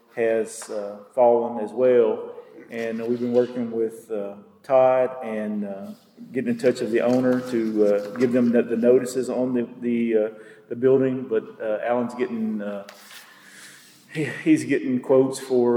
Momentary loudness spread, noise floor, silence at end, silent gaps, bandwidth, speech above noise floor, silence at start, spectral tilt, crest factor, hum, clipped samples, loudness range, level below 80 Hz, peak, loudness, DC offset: 16 LU; -48 dBFS; 0 s; none; 16 kHz; 25 dB; 0.15 s; -6.5 dB/octave; 16 dB; none; under 0.1%; 4 LU; -78 dBFS; -6 dBFS; -23 LUFS; under 0.1%